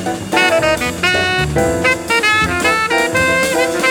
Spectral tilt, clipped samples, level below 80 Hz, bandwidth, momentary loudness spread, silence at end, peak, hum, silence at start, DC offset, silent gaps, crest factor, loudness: -3.5 dB/octave; under 0.1%; -36 dBFS; over 20 kHz; 3 LU; 0 s; 0 dBFS; none; 0 s; under 0.1%; none; 14 dB; -13 LUFS